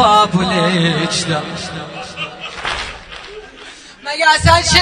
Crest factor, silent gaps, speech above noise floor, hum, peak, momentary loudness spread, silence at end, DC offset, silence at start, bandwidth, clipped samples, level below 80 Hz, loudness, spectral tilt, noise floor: 16 dB; none; 23 dB; none; 0 dBFS; 22 LU; 0 s; under 0.1%; 0 s; 13 kHz; under 0.1%; -34 dBFS; -15 LUFS; -3.5 dB/octave; -37 dBFS